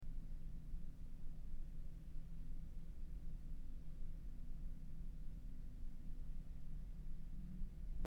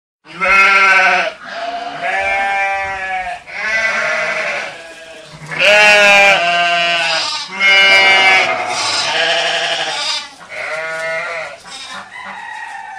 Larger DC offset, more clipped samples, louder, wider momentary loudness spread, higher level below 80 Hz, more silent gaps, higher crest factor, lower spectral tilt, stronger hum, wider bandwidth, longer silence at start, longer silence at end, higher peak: neither; neither; second, -56 LUFS vs -11 LUFS; second, 2 LU vs 21 LU; about the same, -48 dBFS vs -52 dBFS; neither; about the same, 14 dB vs 14 dB; first, -8 dB/octave vs -0.5 dB/octave; neither; second, 2.6 kHz vs 16 kHz; second, 0 s vs 0.25 s; about the same, 0 s vs 0 s; second, -30 dBFS vs 0 dBFS